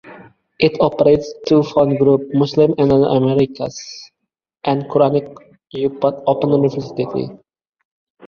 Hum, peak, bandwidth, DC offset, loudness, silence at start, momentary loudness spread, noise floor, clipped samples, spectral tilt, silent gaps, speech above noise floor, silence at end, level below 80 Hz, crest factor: none; 0 dBFS; 7 kHz; under 0.1%; -16 LUFS; 0.05 s; 13 LU; -78 dBFS; under 0.1%; -7.5 dB/octave; none; 62 dB; 0.9 s; -50 dBFS; 16 dB